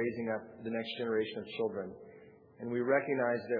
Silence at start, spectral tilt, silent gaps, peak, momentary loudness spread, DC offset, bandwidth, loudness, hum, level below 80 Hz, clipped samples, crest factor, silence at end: 0 s; -4 dB/octave; none; -16 dBFS; 15 LU; under 0.1%; 5 kHz; -35 LUFS; none; -78 dBFS; under 0.1%; 18 dB; 0 s